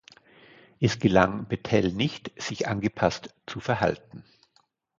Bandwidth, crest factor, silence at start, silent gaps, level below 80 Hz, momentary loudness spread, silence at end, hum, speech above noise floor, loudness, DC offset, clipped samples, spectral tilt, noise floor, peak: 7.6 kHz; 24 dB; 0.8 s; none; -52 dBFS; 13 LU; 0.8 s; none; 42 dB; -26 LUFS; under 0.1%; under 0.1%; -6 dB/octave; -68 dBFS; -4 dBFS